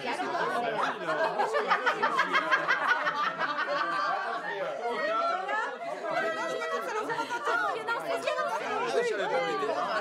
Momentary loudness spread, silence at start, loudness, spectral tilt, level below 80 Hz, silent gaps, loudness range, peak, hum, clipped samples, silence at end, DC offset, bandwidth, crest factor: 6 LU; 0 s; -29 LUFS; -3 dB/octave; under -90 dBFS; none; 4 LU; -10 dBFS; none; under 0.1%; 0 s; under 0.1%; 15.5 kHz; 18 dB